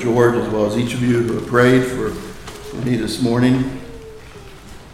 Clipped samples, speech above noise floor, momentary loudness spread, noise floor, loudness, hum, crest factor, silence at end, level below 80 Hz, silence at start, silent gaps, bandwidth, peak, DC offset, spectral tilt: under 0.1%; 21 dB; 22 LU; -37 dBFS; -17 LUFS; none; 18 dB; 0 s; -40 dBFS; 0 s; none; 15 kHz; 0 dBFS; under 0.1%; -6.5 dB/octave